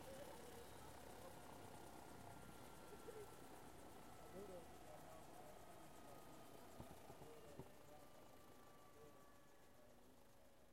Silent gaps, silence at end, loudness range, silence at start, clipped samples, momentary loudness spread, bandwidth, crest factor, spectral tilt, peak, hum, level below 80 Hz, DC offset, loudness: none; 0 s; 5 LU; 0 s; under 0.1%; 8 LU; 16 kHz; 18 dB; -4.5 dB/octave; -44 dBFS; none; -76 dBFS; under 0.1%; -62 LUFS